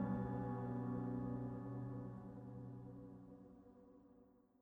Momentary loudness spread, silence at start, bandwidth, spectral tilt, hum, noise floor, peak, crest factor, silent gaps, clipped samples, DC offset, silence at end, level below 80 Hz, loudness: 20 LU; 0 s; 3.7 kHz; -11 dB/octave; none; -69 dBFS; -30 dBFS; 18 dB; none; under 0.1%; under 0.1%; 0.25 s; -66 dBFS; -47 LUFS